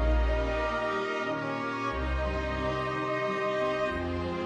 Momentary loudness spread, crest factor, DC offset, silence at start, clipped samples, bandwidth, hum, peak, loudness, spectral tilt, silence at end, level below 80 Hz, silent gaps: 3 LU; 14 dB; under 0.1%; 0 s; under 0.1%; 9.4 kHz; none; -16 dBFS; -30 LUFS; -6.5 dB/octave; 0 s; -36 dBFS; none